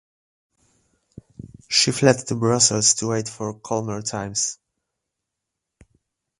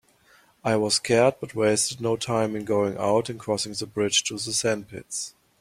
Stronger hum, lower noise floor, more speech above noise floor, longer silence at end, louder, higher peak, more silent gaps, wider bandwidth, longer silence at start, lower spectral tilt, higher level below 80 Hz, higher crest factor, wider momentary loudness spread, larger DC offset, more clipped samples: neither; first, -82 dBFS vs -59 dBFS; first, 61 dB vs 34 dB; first, 1.85 s vs 0.3 s; first, -20 LUFS vs -24 LUFS; first, -2 dBFS vs -6 dBFS; neither; second, 11.5 kHz vs 15.5 kHz; first, 1.45 s vs 0.65 s; about the same, -3 dB/octave vs -3.5 dB/octave; first, -56 dBFS vs -62 dBFS; about the same, 24 dB vs 20 dB; about the same, 12 LU vs 11 LU; neither; neither